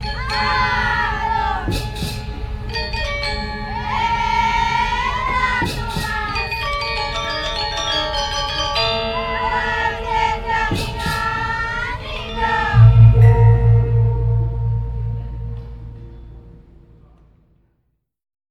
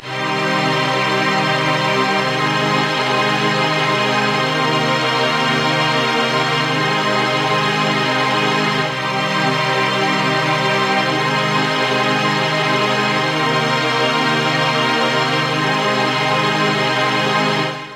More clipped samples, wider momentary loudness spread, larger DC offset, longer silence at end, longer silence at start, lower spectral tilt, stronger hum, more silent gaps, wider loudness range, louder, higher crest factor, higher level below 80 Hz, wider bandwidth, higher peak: neither; first, 13 LU vs 1 LU; neither; first, 1.95 s vs 0 s; about the same, 0 s vs 0 s; first, -5.5 dB/octave vs -4 dB/octave; neither; neither; first, 9 LU vs 1 LU; about the same, -18 LUFS vs -16 LUFS; about the same, 18 dB vs 14 dB; first, -28 dBFS vs -60 dBFS; second, 12.5 kHz vs 16 kHz; first, 0 dBFS vs -4 dBFS